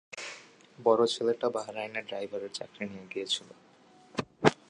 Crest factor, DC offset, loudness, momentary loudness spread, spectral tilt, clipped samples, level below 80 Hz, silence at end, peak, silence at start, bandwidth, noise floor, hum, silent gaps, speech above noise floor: 28 dB; under 0.1%; -32 LUFS; 15 LU; -4 dB/octave; under 0.1%; -70 dBFS; 0.15 s; -4 dBFS; 0.1 s; 11 kHz; -58 dBFS; none; none; 27 dB